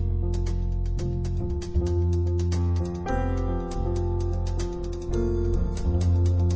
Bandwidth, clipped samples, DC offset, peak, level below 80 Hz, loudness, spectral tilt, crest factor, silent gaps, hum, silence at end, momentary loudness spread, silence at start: 8 kHz; under 0.1%; under 0.1%; -12 dBFS; -28 dBFS; -27 LUFS; -8 dB/octave; 12 dB; none; none; 0 s; 6 LU; 0 s